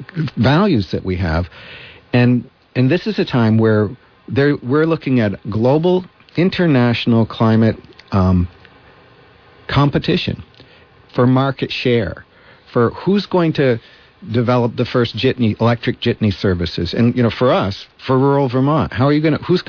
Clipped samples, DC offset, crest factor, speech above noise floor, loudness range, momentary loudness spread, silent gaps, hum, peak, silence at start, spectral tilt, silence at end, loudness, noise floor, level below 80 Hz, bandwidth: under 0.1%; under 0.1%; 14 dB; 31 dB; 3 LU; 9 LU; none; none; -4 dBFS; 0 s; -8.5 dB/octave; 0.05 s; -16 LUFS; -46 dBFS; -40 dBFS; 5.4 kHz